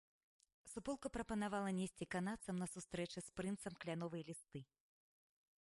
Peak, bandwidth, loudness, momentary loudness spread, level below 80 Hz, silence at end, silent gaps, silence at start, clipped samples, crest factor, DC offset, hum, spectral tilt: -30 dBFS; 11.5 kHz; -46 LUFS; 11 LU; -70 dBFS; 0.95 s; none; 0.65 s; under 0.1%; 16 dB; under 0.1%; none; -5.5 dB/octave